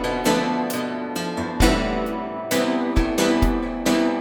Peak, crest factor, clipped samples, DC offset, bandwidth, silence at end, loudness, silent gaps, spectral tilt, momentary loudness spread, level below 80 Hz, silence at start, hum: -2 dBFS; 20 dB; under 0.1%; under 0.1%; over 20 kHz; 0 s; -22 LUFS; none; -4.5 dB/octave; 8 LU; -30 dBFS; 0 s; none